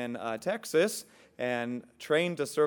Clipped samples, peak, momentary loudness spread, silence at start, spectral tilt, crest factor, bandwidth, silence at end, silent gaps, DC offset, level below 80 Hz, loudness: under 0.1%; -14 dBFS; 9 LU; 0 s; -4 dB/octave; 16 dB; 19 kHz; 0 s; none; under 0.1%; -78 dBFS; -31 LUFS